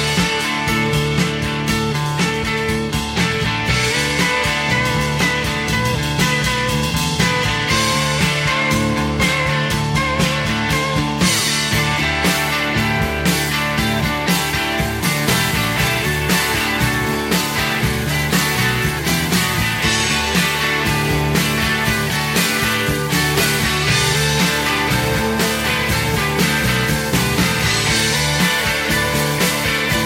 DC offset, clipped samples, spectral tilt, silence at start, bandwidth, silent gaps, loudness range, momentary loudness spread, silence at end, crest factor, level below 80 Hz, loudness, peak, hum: under 0.1%; under 0.1%; -3.5 dB/octave; 0 s; 16.5 kHz; none; 1 LU; 3 LU; 0 s; 16 dB; -32 dBFS; -16 LUFS; -2 dBFS; none